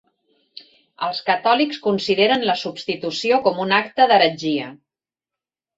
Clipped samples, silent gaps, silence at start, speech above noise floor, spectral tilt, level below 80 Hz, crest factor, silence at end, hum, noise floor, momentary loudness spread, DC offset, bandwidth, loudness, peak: under 0.1%; none; 0.55 s; 70 dB; -4.5 dB/octave; -66 dBFS; 20 dB; 1.05 s; none; -89 dBFS; 10 LU; under 0.1%; 8 kHz; -19 LUFS; -2 dBFS